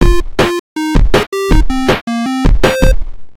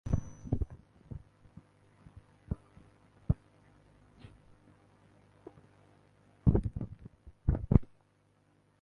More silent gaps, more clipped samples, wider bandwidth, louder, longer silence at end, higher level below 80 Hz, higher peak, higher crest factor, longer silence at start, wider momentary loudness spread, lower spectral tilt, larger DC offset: first, 0.59-0.76 s, 1.27-1.32 s, 2.01-2.07 s vs none; neither; first, 16 kHz vs 6.4 kHz; first, -14 LUFS vs -34 LUFS; second, 0 s vs 0.95 s; first, -14 dBFS vs -42 dBFS; first, 0 dBFS vs -6 dBFS; second, 10 dB vs 30 dB; about the same, 0 s vs 0.05 s; second, 4 LU vs 28 LU; second, -5.5 dB/octave vs -10 dB/octave; neither